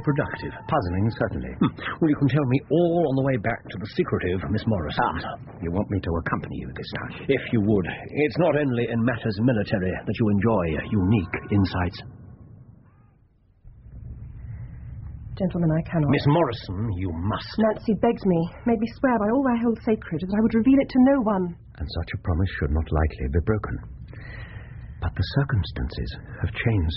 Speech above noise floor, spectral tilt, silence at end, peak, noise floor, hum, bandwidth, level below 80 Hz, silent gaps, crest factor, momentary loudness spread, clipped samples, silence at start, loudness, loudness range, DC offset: 35 dB; -7 dB/octave; 0 s; -8 dBFS; -59 dBFS; none; 5.8 kHz; -38 dBFS; none; 16 dB; 16 LU; under 0.1%; 0 s; -24 LUFS; 7 LU; under 0.1%